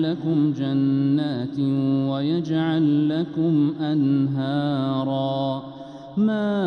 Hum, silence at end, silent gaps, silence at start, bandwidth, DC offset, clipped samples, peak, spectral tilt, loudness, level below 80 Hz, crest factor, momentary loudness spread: none; 0 s; none; 0 s; 6.2 kHz; under 0.1%; under 0.1%; -10 dBFS; -9 dB/octave; -22 LUFS; -64 dBFS; 10 dB; 5 LU